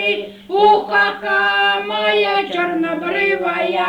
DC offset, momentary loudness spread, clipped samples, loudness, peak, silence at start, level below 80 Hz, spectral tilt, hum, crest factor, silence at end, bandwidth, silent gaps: under 0.1%; 6 LU; under 0.1%; -16 LUFS; -2 dBFS; 0 s; -56 dBFS; -4.5 dB/octave; none; 14 dB; 0 s; 10.5 kHz; none